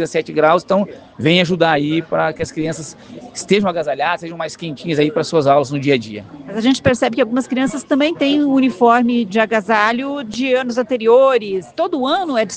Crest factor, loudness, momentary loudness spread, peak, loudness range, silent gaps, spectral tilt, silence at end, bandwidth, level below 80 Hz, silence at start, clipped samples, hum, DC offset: 16 dB; -16 LUFS; 12 LU; 0 dBFS; 4 LU; none; -5.5 dB/octave; 0 s; 9.6 kHz; -54 dBFS; 0 s; under 0.1%; none; under 0.1%